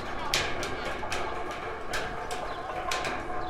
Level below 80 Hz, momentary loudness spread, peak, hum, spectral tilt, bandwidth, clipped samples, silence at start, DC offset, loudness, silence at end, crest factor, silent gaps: -46 dBFS; 7 LU; -8 dBFS; none; -2.5 dB/octave; 16 kHz; under 0.1%; 0 s; under 0.1%; -32 LUFS; 0 s; 24 dB; none